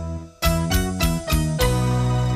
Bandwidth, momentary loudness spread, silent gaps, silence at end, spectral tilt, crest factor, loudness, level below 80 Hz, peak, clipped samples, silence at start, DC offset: 15.5 kHz; 3 LU; none; 0 s; -5 dB/octave; 16 dB; -21 LUFS; -28 dBFS; -6 dBFS; under 0.1%; 0 s; under 0.1%